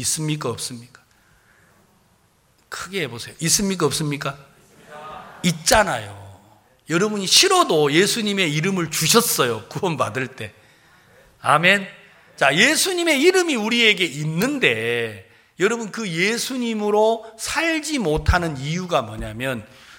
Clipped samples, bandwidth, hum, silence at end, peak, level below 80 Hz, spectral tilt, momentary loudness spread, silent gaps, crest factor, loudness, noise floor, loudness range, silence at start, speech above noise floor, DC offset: under 0.1%; 17 kHz; none; 0.05 s; 0 dBFS; -40 dBFS; -3 dB/octave; 15 LU; none; 20 dB; -19 LUFS; -60 dBFS; 7 LU; 0 s; 40 dB; under 0.1%